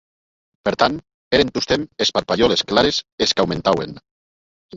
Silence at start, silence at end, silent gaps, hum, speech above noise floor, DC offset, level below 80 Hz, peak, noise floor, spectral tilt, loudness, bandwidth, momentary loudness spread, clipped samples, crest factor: 0.65 s; 0 s; 1.14-1.31 s, 3.12-3.18 s, 4.11-4.69 s; none; over 71 dB; under 0.1%; -46 dBFS; -2 dBFS; under -90 dBFS; -4 dB/octave; -19 LUFS; 7.8 kHz; 7 LU; under 0.1%; 20 dB